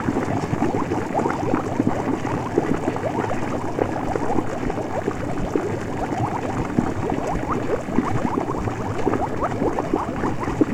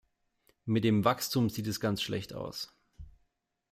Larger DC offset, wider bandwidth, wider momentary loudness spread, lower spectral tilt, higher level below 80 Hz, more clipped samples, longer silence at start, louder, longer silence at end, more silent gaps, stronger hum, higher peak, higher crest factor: neither; about the same, 16 kHz vs 16 kHz; second, 3 LU vs 14 LU; first, -7 dB/octave vs -5.5 dB/octave; first, -38 dBFS vs -60 dBFS; neither; second, 0 s vs 0.65 s; first, -24 LUFS vs -31 LUFS; second, 0 s vs 0.6 s; neither; neither; first, -4 dBFS vs -12 dBFS; about the same, 20 dB vs 22 dB